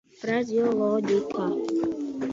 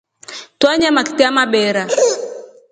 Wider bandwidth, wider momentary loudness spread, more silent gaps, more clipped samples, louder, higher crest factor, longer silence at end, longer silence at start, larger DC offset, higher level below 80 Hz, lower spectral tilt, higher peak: second, 7.8 kHz vs 9.6 kHz; second, 5 LU vs 19 LU; neither; neither; second, -26 LUFS vs -14 LUFS; about the same, 14 dB vs 16 dB; second, 0 s vs 0.25 s; about the same, 0.2 s vs 0.3 s; neither; second, -64 dBFS vs -56 dBFS; first, -6.5 dB/octave vs -2.5 dB/octave; second, -12 dBFS vs 0 dBFS